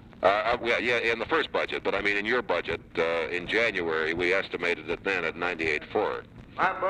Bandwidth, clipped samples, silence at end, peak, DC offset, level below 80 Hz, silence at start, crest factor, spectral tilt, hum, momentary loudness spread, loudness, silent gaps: 10.5 kHz; under 0.1%; 0 s; -10 dBFS; under 0.1%; -54 dBFS; 0.05 s; 18 dB; -4.5 dB/octave; none; 5 LU; -27 LUFS; none